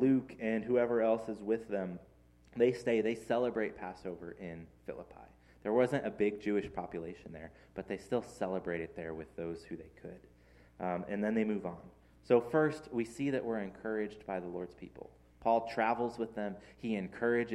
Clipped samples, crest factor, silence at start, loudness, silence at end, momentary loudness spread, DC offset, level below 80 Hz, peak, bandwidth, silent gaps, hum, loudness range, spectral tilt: under 0.1%; 22 dB; 0 s; -35 LUFS; 0 s; 17 LU; under 0.1%; -64 dBFS; -14 dBFS; 12 kHz; none; none; 7 LU; -7 dB/octave